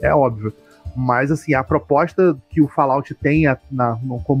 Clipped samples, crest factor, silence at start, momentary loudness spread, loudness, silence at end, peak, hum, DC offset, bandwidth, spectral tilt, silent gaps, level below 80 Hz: under 0.1%; 16 dB; 0 s; 9 LU; -18 LUFS; 0 s; -2 dBFS; none; under 0.1%; 10.5 kHz; -8.5 dB/octave; none; -40 dBFS